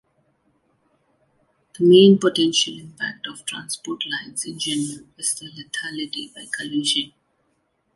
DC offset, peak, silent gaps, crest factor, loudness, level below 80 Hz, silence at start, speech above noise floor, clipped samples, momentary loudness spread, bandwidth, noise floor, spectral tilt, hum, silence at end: under 0.1%; -2 dBFS; none; 20 dB; -21 LUFS; -68 dBFS; 1.8 s; 48 dB; under 0.1%; 17 LU; 11.5 kHz; -69 dBFS; -4 dB/octave; none; 0.9 s